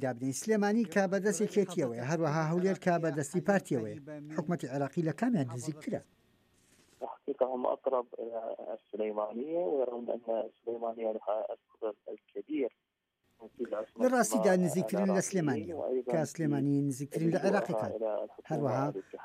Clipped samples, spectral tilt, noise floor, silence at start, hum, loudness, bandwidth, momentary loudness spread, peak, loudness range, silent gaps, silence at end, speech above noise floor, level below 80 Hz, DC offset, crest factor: under 0.1%; -6 dB/octave; -78 dBFS; 0 s; none; -33 LUFS; 15.5 kHz; 11 LU; -16 dBFS; 6 LU; none; 0 s; 45 dB; -80 dBFS; under 0.1%; 18 dB